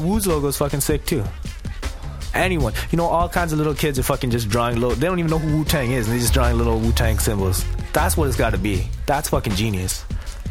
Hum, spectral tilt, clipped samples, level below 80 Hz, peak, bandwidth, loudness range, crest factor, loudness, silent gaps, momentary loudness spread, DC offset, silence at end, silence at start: none; -5 dB/octave; under 0.1%; -26 dBFS; -2 dBFS; 17 kHz; 2 LU; 18 dB; -21 LUFS; none; 8 LU; under 0.1%; 0 s; 0 s